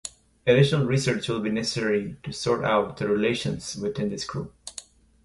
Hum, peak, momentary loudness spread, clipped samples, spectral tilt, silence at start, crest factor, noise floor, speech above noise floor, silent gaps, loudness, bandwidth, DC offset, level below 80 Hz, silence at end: none; -6 dBFS; 15 LU; under 0.1%; -5.5 dB/octave; 0.05 s; 20 dB; -46 dBFS; 21 dB; none; -25 LUFS; 11.5 kHz; under 0.1%; -54 dBFS; 0.45 s